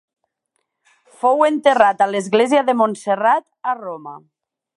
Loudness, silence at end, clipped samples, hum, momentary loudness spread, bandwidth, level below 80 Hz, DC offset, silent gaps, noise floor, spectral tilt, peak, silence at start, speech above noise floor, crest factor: -17 LUFS; 0.6 s; under 0.1%; none; 12 LU; 11.5 kHz; -70 dBFS; under 0.1%; none; -73 dBFS; -4.5 dB/octave; 0 dBFS; 1.25 s; 56 dB; 18 dB